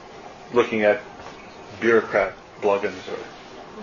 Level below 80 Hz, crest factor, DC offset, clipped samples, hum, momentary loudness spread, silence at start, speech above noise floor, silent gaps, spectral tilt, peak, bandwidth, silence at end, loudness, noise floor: -58 dBFS; 18 dB; under 0.1%; under 0.1%; none; 21 LU; 0 s; 20 dB; none; -5.5 dB/octave; -6 dBFS; 7.4 kHz; 0 s; -22 LUFS; -41 dBFS